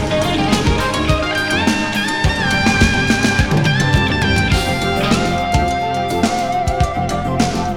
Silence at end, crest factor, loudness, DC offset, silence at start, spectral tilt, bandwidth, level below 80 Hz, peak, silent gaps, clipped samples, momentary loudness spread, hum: 0 s; 16 dB; -16 LUFS; under 0.1%; 0 s; -5 dB/octave; 19 kHz; -26 dBFS; 0 dBFS; none; under 0.1%; 4 LU; none